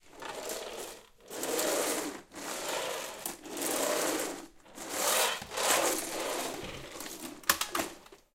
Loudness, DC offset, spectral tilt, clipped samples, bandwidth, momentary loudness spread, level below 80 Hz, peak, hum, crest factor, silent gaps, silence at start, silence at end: -32 LUFS; under 0.1%; -1 dB/octave; under 0.1%; 17 kHz; 15 LU; -64 dBFS; -6 dBFS; none; 30 dB; none; 0.05 s; 0.2 s